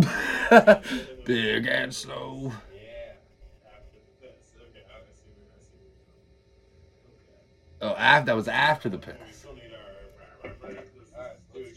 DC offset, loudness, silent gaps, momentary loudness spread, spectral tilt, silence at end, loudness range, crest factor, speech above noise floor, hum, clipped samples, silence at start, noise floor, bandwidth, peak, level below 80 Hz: under 0.1%; -22 LUFS; none; 28 LU; -5 dB/octave; 0.1 s; 18 LU; 26 dB; 37 dB; none; under 0.1%; 0 s; -59 dBFS; 15 kHz; -2 dBFS; -56 dBFS